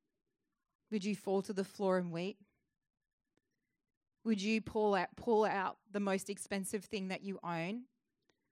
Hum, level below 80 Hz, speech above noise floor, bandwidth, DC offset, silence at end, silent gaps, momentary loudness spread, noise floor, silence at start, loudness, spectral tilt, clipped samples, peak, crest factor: none; -76 dBFS; 45 dB; 16 kHz; under 0.1%; 0.7 s; 3.13-3.18 s, 3.97-4.01 s; 9 LU; -82 dBFS; 0.9 s; -37 LUFS; -5.5 dB/octave; under 0.1%; -20 dBFS; 18 dB